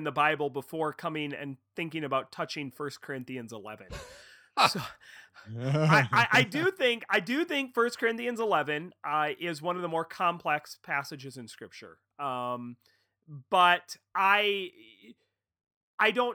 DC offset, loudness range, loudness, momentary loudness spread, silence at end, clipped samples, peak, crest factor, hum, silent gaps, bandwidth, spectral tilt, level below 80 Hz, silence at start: under 0.1%; 9 LU; -29 LUFS; 20 LU; 0 s; under 0.1%; -6 dBFS; 24 dB; none; 15.76-15.98 s; over 20 kHz; -4.5 dB/octave; -66 dBFS; 0 s